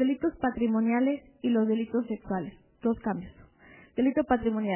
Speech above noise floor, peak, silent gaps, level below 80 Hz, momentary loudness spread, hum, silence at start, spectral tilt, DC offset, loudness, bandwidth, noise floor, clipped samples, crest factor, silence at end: 27 dB; -12 dBFS; none; -56 dBFS; 9 LU; none; 0 s; -6 dB/octave; under 0.1%; -29 LUFS; 3.2 kHz; -55 dBFS; under 0.1%; 16 dB; 0 s